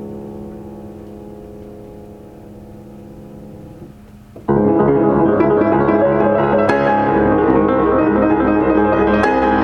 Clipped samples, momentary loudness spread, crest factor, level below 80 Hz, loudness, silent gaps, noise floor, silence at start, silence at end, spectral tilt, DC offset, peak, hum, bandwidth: under 0.1%; 22 LU; 16 dB; -38 dBFS; -14 LUFS; none; -39 dBFS; 0 s; 0 s; -9 dB/octave; under 0.1%; 0 dBFS; none; 6.4 kHz